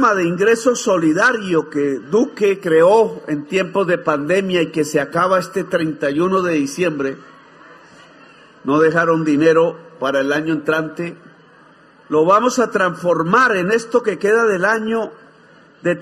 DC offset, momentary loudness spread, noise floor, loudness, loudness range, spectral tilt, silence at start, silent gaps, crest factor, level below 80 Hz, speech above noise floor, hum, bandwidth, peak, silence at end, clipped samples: under 0.1%; 8 LU; -47 dBFS; -16 LUFS; 4 LU; -5 dB/octave; 0 s; none; 16 dB; -62 dBFS; 31 dB; none; 14 kHz; -2 dBFS; 0 s; under 0.1%